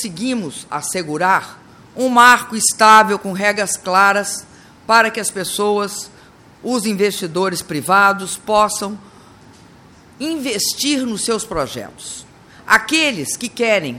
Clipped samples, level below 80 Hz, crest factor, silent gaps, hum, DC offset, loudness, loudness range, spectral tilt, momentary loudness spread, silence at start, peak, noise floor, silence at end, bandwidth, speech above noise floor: under 0.1%; -52 dBFS; 18 dB; none; none; under 0.1%; -16 LUFS; 8 LU; -2.5 dB/octave; 17 LU; 0 s; 0 dBFS; -45 dBFS; 0 s; 17.5 kHz; 28 dB